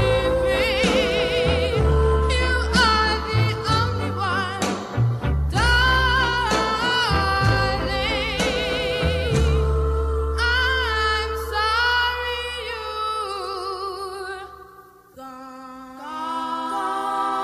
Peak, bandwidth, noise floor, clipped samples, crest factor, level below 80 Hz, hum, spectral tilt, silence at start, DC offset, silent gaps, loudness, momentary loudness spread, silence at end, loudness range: -4 dBFS; 13.5 kHz; -47 dBFS; under 0.1%; 16 dB; -28 dBFS; none; -4.5 dB/octave; 0 s; under 0.1%; none; -21 LUFS; 12 LU; 0 s; 10 LU